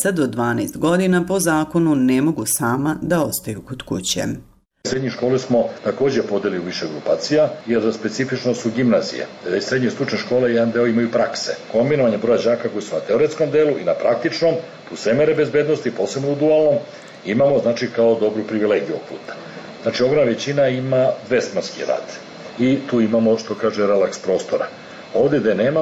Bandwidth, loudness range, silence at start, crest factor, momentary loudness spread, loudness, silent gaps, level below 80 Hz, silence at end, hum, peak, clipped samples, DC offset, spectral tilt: 16.5 kHz; 3 LU; 0 s; 12 dB; 9 LU; -19 LUFS; none; -56 dBFS; 0 s; none; -8 dBFS; under 0.1%; under 0.1%; -5 dB/octave